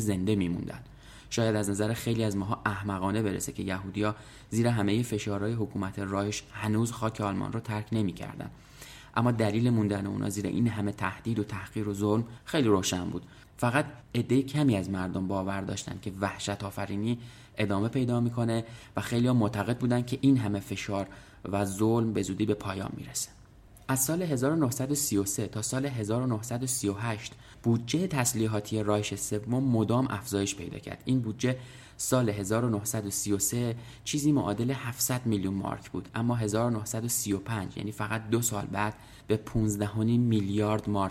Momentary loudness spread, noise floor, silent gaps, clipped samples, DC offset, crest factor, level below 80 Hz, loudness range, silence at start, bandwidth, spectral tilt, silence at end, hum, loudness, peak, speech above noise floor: 9 LU; -53 dBFS; none; under 0.1%; under 0.1%; 18 dB; -56 dBFS; 3 LU; 0 s; 16 kHz; -5.5 dB/octave; 0 s; none; -30 LUFS; -10 dBFS; 24 dB